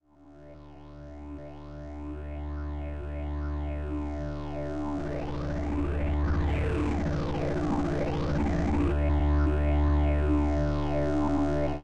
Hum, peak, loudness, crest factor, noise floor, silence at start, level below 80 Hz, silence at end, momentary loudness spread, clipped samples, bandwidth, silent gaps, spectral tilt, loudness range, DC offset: none; -16 dBFS; -30 LUFS; 12 dB; -52 dBFS; 0 s; -34 dBFS; 0 s; 17 LU; under 0.1%; 7.6 kHz; none; -8.5 dB/octave; 10 LU; 0.9%